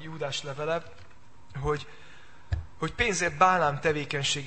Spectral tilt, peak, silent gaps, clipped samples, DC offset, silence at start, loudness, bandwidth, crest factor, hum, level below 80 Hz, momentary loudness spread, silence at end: -3.5 dB/octave; -6 dBFS; none; under 0.1%; 0.7%; 0 s; -28 LUFS; 8.8 kHz; 24 dB; none; -46 dBFS; 14 LU; 0 s